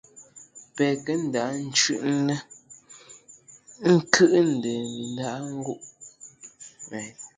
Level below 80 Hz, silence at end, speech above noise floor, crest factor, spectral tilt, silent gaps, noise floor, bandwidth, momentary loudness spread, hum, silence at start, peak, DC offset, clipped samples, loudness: -70 dBFS; 0.1 s; 28 dB; 26 dB; -4 dB/octave; none; -52 dBFS; 9.6 kHz; 26 LU; none; 0.15 s; 0 dBFS; under 0.1%; under 0.1%; -24 LUFS